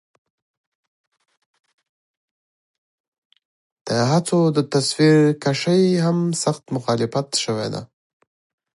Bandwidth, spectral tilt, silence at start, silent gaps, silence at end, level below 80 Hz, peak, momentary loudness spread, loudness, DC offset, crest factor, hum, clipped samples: 11.5 kHz; -5.5 dB/octave; 3.85 s; none; 0.9 s; -66 dBFS; -4 dBFS; 10 LU; -19 LUFS; under 0.1%; 18 dB; none; under 0.1%